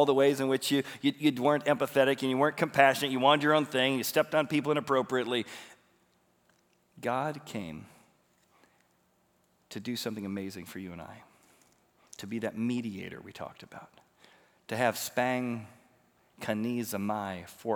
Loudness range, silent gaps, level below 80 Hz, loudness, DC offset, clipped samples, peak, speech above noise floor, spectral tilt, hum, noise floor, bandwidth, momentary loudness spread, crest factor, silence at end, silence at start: 15 LU; none; -78 dBFS; -29 LUFS; under 0.1%; under 0.1%; -8 dBFS; 41 dB; -4.5 dB/octave; none; -70 dBFS; over 20 kHz; 19 LU; 24 dB; 0 s; 0 s